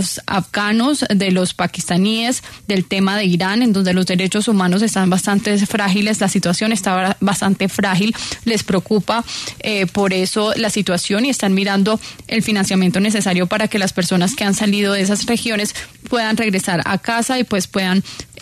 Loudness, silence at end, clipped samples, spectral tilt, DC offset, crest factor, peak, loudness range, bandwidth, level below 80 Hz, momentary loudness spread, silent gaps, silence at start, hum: -17 LUFS; 0 s; under 0.1%; -4.5 dB/octave; under 0.1%; 12 dB; -4 dBFS; 2 LU; 13.5 kHz; -50 dBFS; 5 LU; none; 0 s; none